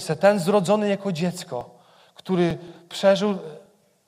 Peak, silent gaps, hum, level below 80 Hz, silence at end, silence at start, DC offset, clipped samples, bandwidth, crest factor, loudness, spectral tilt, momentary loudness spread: -4 dBFS; none; none; -62 dBFS; 0.5 s; 0 s; under 0.1%; under 0.1%; 16 kHz; 20 dB; -22 LUFS; -6 dB/octave; 16 LU